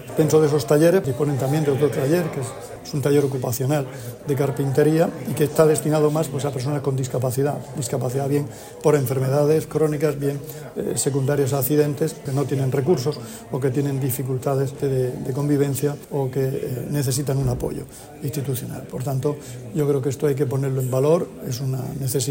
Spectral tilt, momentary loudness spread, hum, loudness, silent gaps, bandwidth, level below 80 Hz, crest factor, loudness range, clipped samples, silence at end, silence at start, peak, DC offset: -6.5 dB/octave; 11 LU; none; -22 LUFS; none; 16.5 kHz; -50 dBFS; 18 dB; 4 LU; under 0.1%; 0 s; 0 s; -4 dBFS; under 0.1%